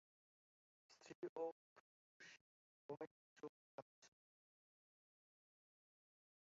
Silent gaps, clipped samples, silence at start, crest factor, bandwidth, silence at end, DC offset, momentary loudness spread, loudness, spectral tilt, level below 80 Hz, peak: 1.15-1.22 s, 1.29-1.36 s, 1.52-2.20 s, 2.41-2.89 s, 3.07-3.36 s, 3.49-4.02 s; under 0.1%; 0.9 s; 22 dB; 7.4 kHz; 2.45 s; under 0.1%; 18 LU; -56 LUFS; -4.5 dB/octave; under -90 dBFS; -38 dBFS